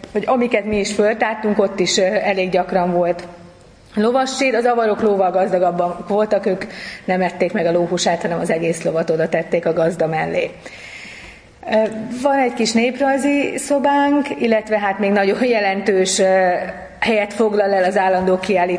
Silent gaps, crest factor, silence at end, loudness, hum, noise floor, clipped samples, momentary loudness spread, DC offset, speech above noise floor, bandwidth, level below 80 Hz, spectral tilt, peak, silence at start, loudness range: none; 16 dB; 0 s; -17 LUFS; none; -44 dBFS; under 0.1%; 6 LU; under 0.1%; 27 dB; 10.5 kHz; -52 dBFS; -4.5 dB/octave; -2 dBFS; 0 s; 3 LU